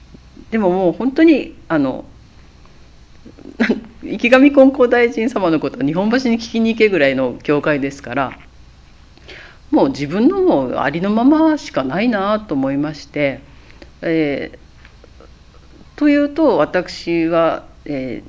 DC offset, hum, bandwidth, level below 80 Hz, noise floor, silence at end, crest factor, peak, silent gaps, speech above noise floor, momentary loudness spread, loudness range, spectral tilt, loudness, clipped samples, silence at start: under 0.1%; none; 8 kHz; -46 dBFS; -43 dBFS; 0 s; 16 dB; 0 dBFS; none; 28 dB; 11 LU; 6 LU; -6.5 dB/octave; -16 LUFS; under 0.1%; 0.4 s